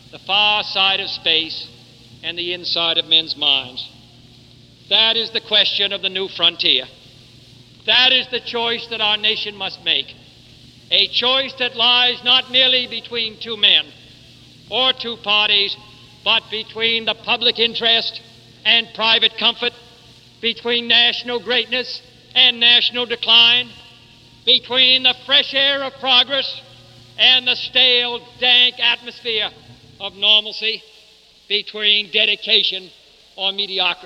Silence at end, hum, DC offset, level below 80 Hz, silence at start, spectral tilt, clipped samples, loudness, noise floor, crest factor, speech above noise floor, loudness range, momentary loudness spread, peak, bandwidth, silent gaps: 0 s; none; under 0.1%; -60 dBFS; 0.15 s; -2.5 dB/octave; under 0.1%; -15 LUFS; -49 dBFS; 18 dB; 32 dB; 4 LU; 12 LU; 0 dBFS; 11.5 kHz; none